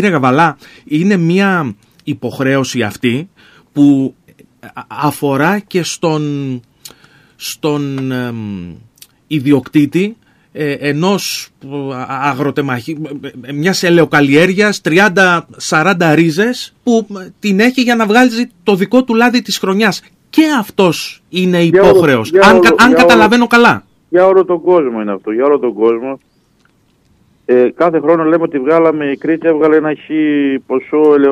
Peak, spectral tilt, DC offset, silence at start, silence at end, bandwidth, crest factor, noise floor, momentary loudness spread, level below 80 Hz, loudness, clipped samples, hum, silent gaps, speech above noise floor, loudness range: 0 dBFS; -5.5 dB/octave; under 0.1%; 0 s; 0 s; 15.5 kHz; 12 dB; -54 dBFS; 15 LU; -48 dBFS; -12 LUFS; under 0.1%; none; none; 42 dB; 9 LU